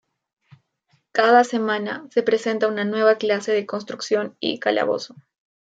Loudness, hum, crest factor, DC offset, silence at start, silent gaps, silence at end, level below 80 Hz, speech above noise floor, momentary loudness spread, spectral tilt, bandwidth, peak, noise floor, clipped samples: -21 LUFS; none; 18 dB; under 0.1%; 1.15 s; none; 0.75 s; -76 dBFS; 46 dB; 10 LU; -4 dB/octave; 8 kHz; -4 dBFS; -67 dBFS; under 0.1%